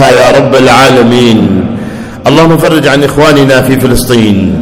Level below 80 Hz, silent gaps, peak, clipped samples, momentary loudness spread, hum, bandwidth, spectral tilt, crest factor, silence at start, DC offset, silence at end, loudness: -26 dBFS; none; 0 dBFS; 20%; 8 LU; none; over 20 kHz; -5.5 dB/octave; 4 dB; 0 s; under 0.1%; 0 s; -5 LUFS